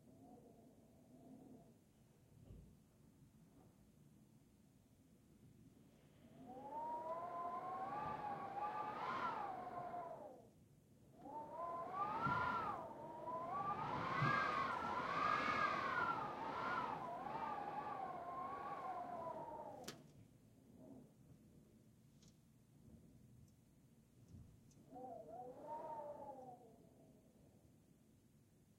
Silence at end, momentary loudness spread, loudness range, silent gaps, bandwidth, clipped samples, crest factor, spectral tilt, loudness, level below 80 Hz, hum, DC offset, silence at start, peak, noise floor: 0.4 s; 26 LU; 25 LU; none; 16 kHz; under 0.1%; 20 dB; -5.5 dB/octave; -45 LUFS; -76 dBFS; none; under 0.1%; 0.05 s; -28 dBFS; -71 dBFS